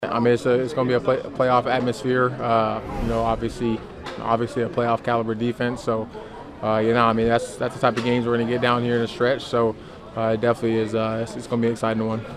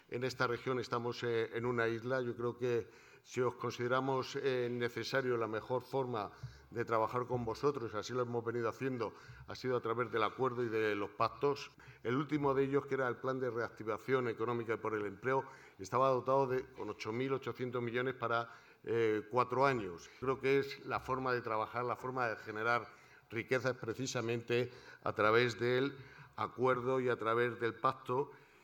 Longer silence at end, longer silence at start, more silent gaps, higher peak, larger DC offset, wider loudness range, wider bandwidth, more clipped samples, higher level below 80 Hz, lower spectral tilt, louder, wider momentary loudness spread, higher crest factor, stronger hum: second, 0 s vs 0.25 s; about the same, 0 s vs 0.1 s; neither; first, -4 dBFS vs -16 dBFS; neither; about the same, 3 LU vs 3 LU; second, 13 kHz vs 18 kHz; neither; first, -44 dBFS vs -70 dBFS; about the same, -6.5 dB/octave vs -6 dB/octave; first, -22 LUFS vs -37 LUFS; about the same, 8 LU vs 9 LU; about the same, 18 dB vs 20 dB; neither